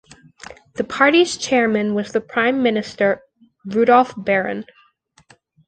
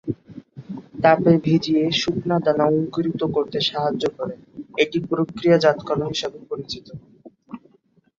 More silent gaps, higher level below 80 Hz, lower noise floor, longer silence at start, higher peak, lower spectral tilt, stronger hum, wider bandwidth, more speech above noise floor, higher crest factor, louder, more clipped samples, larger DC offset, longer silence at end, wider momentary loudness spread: neither; about the same, -60 dBFS vs -56 dBFS; about the same, -57 dBFS vs -60 dBFS; first, 0.5 s vs 0.05 s; about the same, -2 dBFS vs -2 dBFS; second, -4.5 dB/octave vs -6 dB/octave; neither; first, 9.2 kHz vs 7.6 kHz; about the same, 39 dB vs 40 dB; about the same, 18 dB vs 20 dB; first, -18 LUFS vs -21 LUFS; neither; neither; first, 1.05 s vs 0.6 s; second, 14 LU vs 23 LU